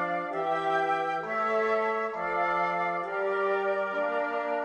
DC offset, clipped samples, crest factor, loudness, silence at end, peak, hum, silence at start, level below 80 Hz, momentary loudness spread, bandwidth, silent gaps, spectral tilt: under 0.1%; under 0.1%; 14 dB; -28 LUFS; 0 s; -16 dBFS; none; 0 s; -70 dBFS; 3 LU; 9.8 kHz; none; -5.5 dB/octave